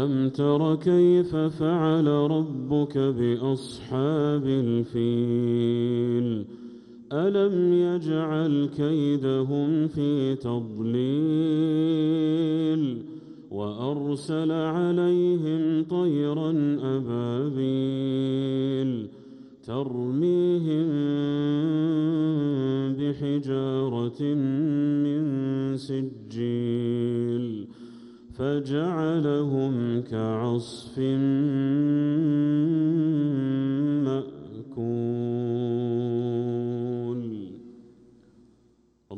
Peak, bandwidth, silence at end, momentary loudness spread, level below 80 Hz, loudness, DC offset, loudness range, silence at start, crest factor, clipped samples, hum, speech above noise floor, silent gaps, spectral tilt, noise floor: -12 dBFS; 10.5 kHz; 0 s; 9 LU; -64 dBFS; -25 LUFS; under 0.1%; 4 LU; 0 s; 14 dB; under 0.1%; none; 38 dB; none; -9 dB/octave; -63 dBFS